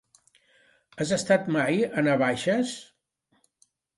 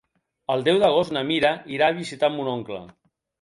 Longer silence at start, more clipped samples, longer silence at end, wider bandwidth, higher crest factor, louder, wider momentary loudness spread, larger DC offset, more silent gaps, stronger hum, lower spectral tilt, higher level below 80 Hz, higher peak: first, 0.95 s vs 0.5 s; neither; first, 1.15 s vs 0.5 s; about the same, 11.5 kHz vs 11.5 kHz; about the same, 20 dB vs 18 dB; second, -25 LUFS vs -22 LUFS; second, 9 LU vs 14 LU; neither; neither; neither; about the same, -5 dB/octave vs -5.5 dB/octave; about the same, -66 dBFS vs -62 dBFS; about the same, -8 dBFS vs -6 dBFS